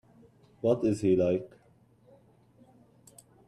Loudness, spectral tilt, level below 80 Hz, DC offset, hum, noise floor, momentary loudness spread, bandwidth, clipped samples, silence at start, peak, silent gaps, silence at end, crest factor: -28 LUFS; -8 dB/octave; -66 dBFS; under 0.1%; none; -63 dBFS; 8 LU; 12.5 kHz; under 0.1%; 0.65 s; -14 dBFS; none; 2 s; 18 dB